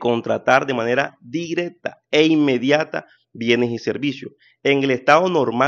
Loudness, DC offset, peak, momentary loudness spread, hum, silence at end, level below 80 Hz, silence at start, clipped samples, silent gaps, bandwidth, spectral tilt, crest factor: -19 LUFS; under 0.1%; 0 dBFS; 13 LU; none; 0 s; -66 dBFS; 0 s; under 0.1%; none; 7.4 kHz; -5.5 dB/octave; 18 dB